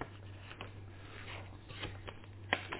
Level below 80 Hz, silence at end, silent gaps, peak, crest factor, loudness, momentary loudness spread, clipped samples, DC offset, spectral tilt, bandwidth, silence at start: -58 dBFS; 0 s; none; -14 dBFS; 32 dB; -46 LUFS; 12 LU; under 0.1%; under 0.1%; -2.5 dB/octave; 4 kHz; 0 s